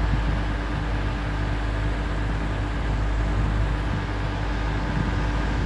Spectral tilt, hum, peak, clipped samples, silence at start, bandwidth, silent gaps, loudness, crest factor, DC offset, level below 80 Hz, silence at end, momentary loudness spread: -7 dB/octave; none; -10 dBFS; under 0.1%; 0 s; 8.6 kHz; none; -27 LUFS; 14 dB; under 0.1%; -26 dBFS; 0 s; 2 LU